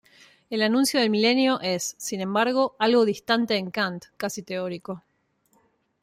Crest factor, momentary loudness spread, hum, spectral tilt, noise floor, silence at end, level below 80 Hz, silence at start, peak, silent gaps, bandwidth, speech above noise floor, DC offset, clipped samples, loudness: 16 dB; 12 LU; none; -3.5 dB/octave; -68 dBFS; 1.05 s; -70 dBFS; 0.5 s; -8 dBFS; none; 16 kHz; 44 dB; under 0.1%; under 0.1%; -24 LUFS